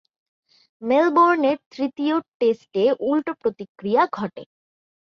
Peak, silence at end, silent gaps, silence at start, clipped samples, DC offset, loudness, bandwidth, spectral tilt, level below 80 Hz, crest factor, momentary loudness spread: -6 dBFS; 0.7 s; 1.66-1.71 s, 2.28-2.40 s, 3.69-3.75 s; 0.8 s; under 0.1%; under 0.1%; -21 LUFS; 6.8 kHz; -7 dB/octave; -68 dBFS; 16 dB; 12 LU